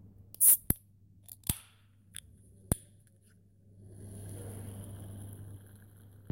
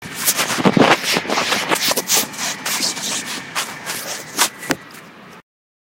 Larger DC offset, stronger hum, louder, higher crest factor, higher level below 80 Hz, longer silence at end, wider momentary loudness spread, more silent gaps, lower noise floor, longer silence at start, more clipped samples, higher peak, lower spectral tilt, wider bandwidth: neither; neither; second, -28 LUFS vs -18 LUFS; first, 30 dB vs 20 dB; first, -54 dBFS vs -60 dBFS; second, 0.05 s vs 0.55 s; first, 28 LU vs 11 LU; neither; first, -63 dBFS vs -39 dBFS; about the same, 0.05 s vs 0 s; neither; second, -6 dBFS vs 0 dBFS; about the same, -3 dB/octave vs -2 dB/octave; about the same, 17 kHz vs 16.5 kHz